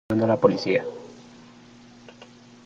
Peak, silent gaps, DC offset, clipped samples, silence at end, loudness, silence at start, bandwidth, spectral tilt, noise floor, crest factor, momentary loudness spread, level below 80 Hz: -2 dBFS; none; under 0.1%; under 0.1%; 0.4 s; -22 LUFS; 0.1 s; 7.6 kHz; -7 dB/octave; -49 dBFS; 24 dB; 22 LU; -62 dBFS